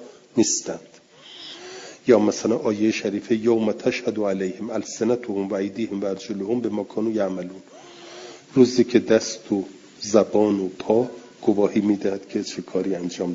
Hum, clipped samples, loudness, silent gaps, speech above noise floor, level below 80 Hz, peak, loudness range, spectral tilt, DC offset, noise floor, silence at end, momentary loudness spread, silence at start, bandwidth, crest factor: none; under 0.1%; -23 LUFS; none; 20 dB; -66 dBFS; -2 dBFS; 5 LU; -5 dB/octave; under 0.1%; -42 dBFS; 0 s; 19 LU; 0 s; 7.8 kHz; 22 dB